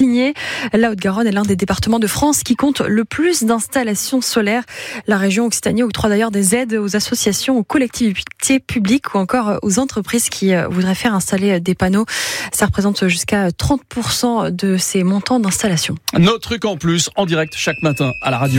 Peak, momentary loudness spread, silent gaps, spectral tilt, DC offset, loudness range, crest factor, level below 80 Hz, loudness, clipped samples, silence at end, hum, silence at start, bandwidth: -2 dBFS; 4 LU; none; -4.5 dB/octave; under 0.1%; 1 LU; 14 dB; -42 dBFS; -16 LUFS; under 0.1%; 0 s; none; 0 s; 17 kHz